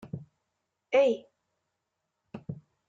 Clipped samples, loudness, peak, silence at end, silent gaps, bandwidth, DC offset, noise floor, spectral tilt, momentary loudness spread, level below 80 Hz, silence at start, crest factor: under 0.1%; -27 LUFS; -12 dBFS; 0.3 s; none; 7.6 kHz; under 0.1%; -83 dBFS; -6.5 dB/octave; 20 LU; -74 dBFS; 0.05 s; 20 dB